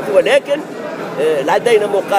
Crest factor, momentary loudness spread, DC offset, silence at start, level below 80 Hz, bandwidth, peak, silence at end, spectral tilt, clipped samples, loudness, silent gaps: 14 dB; 12 LU; under 0.1%; 0 s; -62 dBFS; 16 kHz; 0 dBFS; 0 s; -4 dB/octave; under 0.1%; -15 LUFS; none